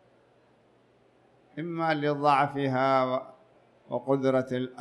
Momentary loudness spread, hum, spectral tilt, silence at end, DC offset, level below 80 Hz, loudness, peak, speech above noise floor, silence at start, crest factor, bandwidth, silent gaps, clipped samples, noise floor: 13 LU; none; -7.5 dB/octave; 0 s; under 0.1%; -74 dBFS; -27 LUFS; -10 dBFS; 36 dB; 1.55 s; 20 dB; 10.5 kHz; none; under 0.1%; -63 dBFS